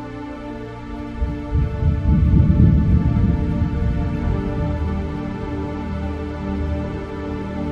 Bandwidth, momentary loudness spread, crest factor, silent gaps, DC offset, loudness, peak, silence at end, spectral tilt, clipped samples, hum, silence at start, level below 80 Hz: 6 kHz; 16 LU; 18 dB; none; under 0.1%; -21 LUFS; -2 dBFS; 0 s; -9.5 dB/octave; under 0.1%; none; 0 s; -24 dBFS